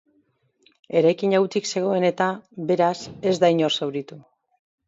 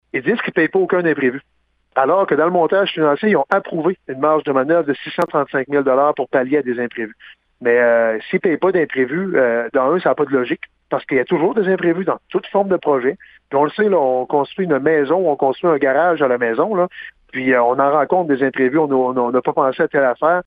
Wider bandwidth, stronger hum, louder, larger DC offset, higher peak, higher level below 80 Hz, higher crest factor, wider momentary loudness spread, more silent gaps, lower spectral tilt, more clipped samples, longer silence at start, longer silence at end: first, 7.8 kHz vs 5 kHz; neither; second, -22 LUFS vs -17 LUFS; neither; second, -6 dBFS vs 0 dBFS; second, -68 dBFS vs -62 dBFS; about the same, 18 dB vs 16 dB; about the same, 9 LU vs 7 LU; neither; second, -5 dB/octave vs -8.5 dB/octave; neither; first, 0.9 s vs 0.15 s; first, 0.7 s vs 0.05 s